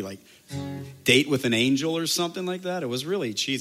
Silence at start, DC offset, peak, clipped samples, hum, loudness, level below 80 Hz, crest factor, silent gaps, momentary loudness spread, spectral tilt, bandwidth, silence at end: 0 s; under 0.1%; -4 dBFS; under 0.1%; none; -24 LUFS; -64 dBFS; 22 dB; none; 16 LU; -3.5 dB/octave; 16 kHz; 0 s